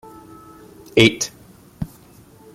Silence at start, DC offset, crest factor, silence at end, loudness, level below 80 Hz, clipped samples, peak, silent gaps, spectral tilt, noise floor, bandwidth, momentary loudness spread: 0.95 s; under 0.1%; 22 dB; 0.7 s; -17 LUFS; -48 dBFS; under 0.1%; -2 dBFS; none; -4 dB/octave; -47 dBFS; 16 kHz; 19 LU